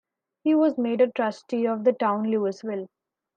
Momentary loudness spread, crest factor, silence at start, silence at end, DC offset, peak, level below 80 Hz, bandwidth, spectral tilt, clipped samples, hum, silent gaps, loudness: 11 LU; 16 dB; 0.45 s; 0.5 s; under 0.1%; -10 dBFS; -80 dBFS; 7.4 kHz; -7 dB/octave; under 0.1%; none; none; -24 LUFS